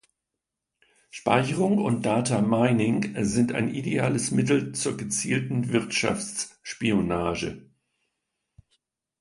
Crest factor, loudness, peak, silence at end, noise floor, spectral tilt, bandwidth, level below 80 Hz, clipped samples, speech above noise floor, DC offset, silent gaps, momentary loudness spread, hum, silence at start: 20 dB; -25 LUFS; -6 dBFS; 1.6 s; -85 dBFS; -5 dB/octave; 11.5 kHz; -54 dBFS; under 0.1%; 61 dB; under 0.1%; none; 9 LU; none; 1.15 s